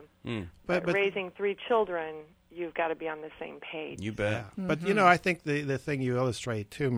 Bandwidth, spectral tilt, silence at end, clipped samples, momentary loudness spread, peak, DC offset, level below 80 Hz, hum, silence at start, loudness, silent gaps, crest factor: 14.5 kHz; -6 dB/octave; 0 s; under 0.1%; 15 LU; -6 dBFS; under 0.1%; -60 dBFS; none; 0 s; -30 LUFS; none; 24 dB